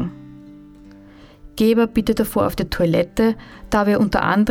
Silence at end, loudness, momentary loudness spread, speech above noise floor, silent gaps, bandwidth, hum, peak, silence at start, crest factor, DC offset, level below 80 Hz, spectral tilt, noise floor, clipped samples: 0 s; -19 LUFS; 12 LU; 26 dB; none; 17.5 kHz; none; -4 dBFS; 0 s; 14 dB; under 0.1%; -38 dBFS; -6.5 dB/octave; -44 dBFS; under 0.1%